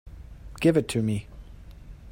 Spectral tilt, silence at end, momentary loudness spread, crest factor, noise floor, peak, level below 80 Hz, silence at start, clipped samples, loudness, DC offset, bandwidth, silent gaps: -6.5 dB/octave; 0 s; 25 LU; 20 dB; -44 dBFS; -8 dBFS; -46 dBFS; 0.05 s; under 0.1%; -25 LUFS; under 0.1%; 16 kHz; none